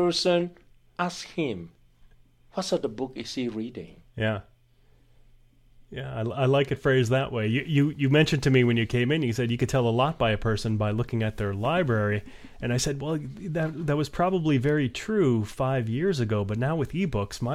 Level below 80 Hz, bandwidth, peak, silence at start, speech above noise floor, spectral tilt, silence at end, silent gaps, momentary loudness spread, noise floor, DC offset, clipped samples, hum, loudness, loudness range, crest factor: -48 dBFS; 14 kHz; -8 dBFS; 0 s; 34 dB; -6 dB/octave; 0 s; none; 10 LU; -59 dBFS; under 0.1%; under 0.1%; none; -26 LUFS; 9 LU; 18 dB